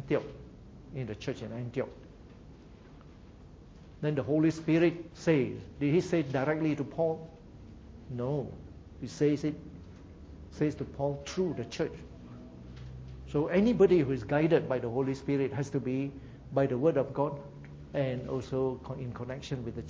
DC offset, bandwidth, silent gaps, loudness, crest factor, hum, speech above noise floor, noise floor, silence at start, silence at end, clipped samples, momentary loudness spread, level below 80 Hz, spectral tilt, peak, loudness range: under 0.1%; 8 kHz; none; -31 LUFS; 20 dB; none; 22 dB; -52 dBFS; 0 s; 0 s; under 0.1%; 22 LU; -54 dBFS; -7.5 dB/octave; -12 dBFS; 8 LU